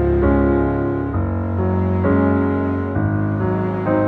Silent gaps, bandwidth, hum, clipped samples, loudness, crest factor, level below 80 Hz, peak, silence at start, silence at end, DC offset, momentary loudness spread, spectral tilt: none; 4.2 kHz; none; under 0.1%; -19 LUFS; 14 dB; -30 dBFS; -4 dBFS; 0 s; 0 s; under 0.1%; 5 LU; -11.5 dB/octave